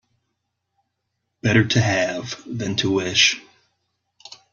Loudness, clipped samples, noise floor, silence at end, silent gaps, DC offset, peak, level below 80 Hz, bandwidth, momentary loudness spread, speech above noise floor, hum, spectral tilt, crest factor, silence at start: -19 LUFS; under 0.1%; -77 dBFS; 1.1 s; none; under 0.1%; -2 dBFS; -56 dBFS; 7.4 kHz; 14 LU; 57 dB; none; -4 dB/octave; 22 dB; 1.45 s